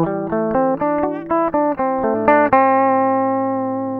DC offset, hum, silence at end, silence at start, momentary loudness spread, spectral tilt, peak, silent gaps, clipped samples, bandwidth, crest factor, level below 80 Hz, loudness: under 0.1%; none; 0 s; 0 s; 7 LU; -10 dB/octave; 0 dBFS; none; under 0.1%; 4.3 kHz; 16 dB; -50 dBFS; -17 LUFS